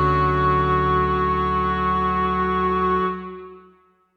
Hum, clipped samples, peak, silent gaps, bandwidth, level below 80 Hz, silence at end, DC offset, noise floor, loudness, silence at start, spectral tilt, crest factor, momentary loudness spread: none; under 0.1%; -6 dBFS; none; 6.6 kHz; -34 dBFS; 0.55 s; under 0.1%; -56 dBFS; -20 LUFS; 0 s; -8.5 dB/octave; 14 dB; 6 LU